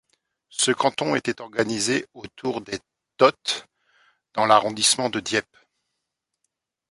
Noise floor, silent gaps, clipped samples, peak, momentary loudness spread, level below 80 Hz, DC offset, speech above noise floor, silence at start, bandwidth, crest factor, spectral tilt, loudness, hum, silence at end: -81 dBFS; none; under 0.1%; -2 dBFS; 14 LU; -64 dBFS; under 0.1%; 58 dB; 0.55 s; 11.5 kHz; 24 dB; -2.5 dB/octave; -22 LUFS; none; 1.5 s